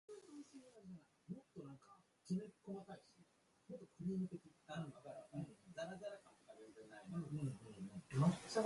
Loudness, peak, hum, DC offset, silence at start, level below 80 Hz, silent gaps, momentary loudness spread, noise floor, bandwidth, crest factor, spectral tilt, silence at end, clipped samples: -48 LUFS; -26 dBFS; none; under 0.1%; 0.1 s; -78 dBFS; none; 17 LU; -74 dBFS; 11.5 kHz; 22 dB; -7 dB/octave; 0 s; under 0.1%